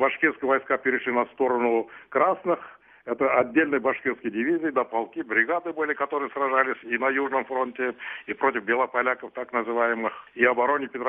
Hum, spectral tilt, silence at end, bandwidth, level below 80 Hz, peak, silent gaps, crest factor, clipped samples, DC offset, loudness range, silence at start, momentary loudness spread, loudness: none; -7.5 dB/octave; 0 s; 3.8 kHz; -72 dBFS; -6 dBFS; none; 20 dB; under 0.1%; under 0.1%; 1 LU; 0 s; 7 LU; -25 LUFS